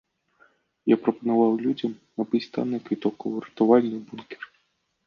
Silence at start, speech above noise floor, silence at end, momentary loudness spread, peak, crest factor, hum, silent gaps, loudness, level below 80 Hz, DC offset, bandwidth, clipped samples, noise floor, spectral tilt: 0.85 s; 48 dB; 0.6 s; 19 LU; -4 dBFS; 20 dB; none; none; -25 LUFS; -72 dBFS; under 0.1%; 6.6 kHz; under 0.1%; -72 dBFS; -8.5 dB/octave